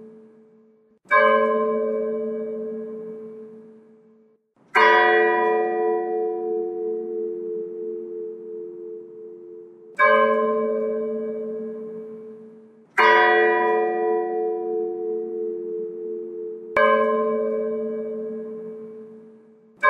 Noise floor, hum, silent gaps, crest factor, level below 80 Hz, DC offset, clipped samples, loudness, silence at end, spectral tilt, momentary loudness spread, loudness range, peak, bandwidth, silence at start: -59 dBFS; none; none; 22 dB; -74 dBFS; under 0.1%; under 0.1%; -22 LUFS; 0 s; -5 dB/octave; 21 LU; 7 LU; -2 dBFS; 6.2 kHz; 0 s